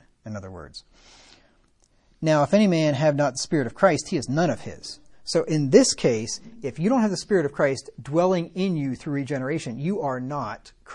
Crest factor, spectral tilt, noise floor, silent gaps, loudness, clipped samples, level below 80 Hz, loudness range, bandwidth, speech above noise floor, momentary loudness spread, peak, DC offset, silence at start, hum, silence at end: 22 dB; -5.5 dB/octave; -62 dBFS; none; -23 LUFS; under 0.1%; -58 dBFS; 3 LU; 11 kHz; 38 dB; 18 LU; -2 dBFS; under 0.1%; 0.25 s; none; 0 s